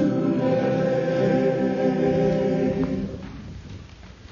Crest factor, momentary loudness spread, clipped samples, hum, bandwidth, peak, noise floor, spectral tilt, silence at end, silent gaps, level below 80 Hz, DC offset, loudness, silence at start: 14 dB; 18 LU; under 0.1%; none; 7.2 kHz; -8 dBFS; -43 dBFS; -8.5 dB/octave; 0 s; none; -46 dBFS; under 0.1%; -23 LUFS; 0 s